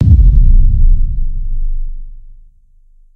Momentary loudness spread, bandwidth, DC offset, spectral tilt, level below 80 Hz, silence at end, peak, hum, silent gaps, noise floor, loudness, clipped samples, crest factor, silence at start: 18 LU; 0.6 kHz; under 0.1%; -12 dB/octave; -10 dBFS; 0.85 s; 0 dBFS; none; none; -44 dBFS; -14 LUFS; 0.2%; 10 dB; 0 s